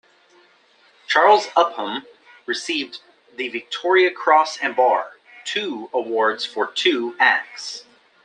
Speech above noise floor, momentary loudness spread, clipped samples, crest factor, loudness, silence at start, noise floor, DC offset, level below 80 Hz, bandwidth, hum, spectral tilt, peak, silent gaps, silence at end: 36 dB; 16 LU; under 0.1%; 20 dB; -19 LUFS; 1.1 s; -56 dBFS; under 0.1%; -78 dBFS; 10 kHz; none; -2 dB/octave; -2 dBFS; none; 0.45 s